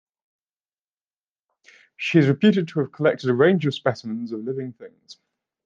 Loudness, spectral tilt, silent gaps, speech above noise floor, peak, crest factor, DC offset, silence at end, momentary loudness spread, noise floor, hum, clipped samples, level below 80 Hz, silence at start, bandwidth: -21 LUFS; -7.5 dB/octave; none; over 69 dB; -4 dBFS; 20 dB; under 0.1%; 0.5 s; 12 LU; under -90 dBFS; none; under 0.1%; -72 dBFS; 2 s; 7.6 kHz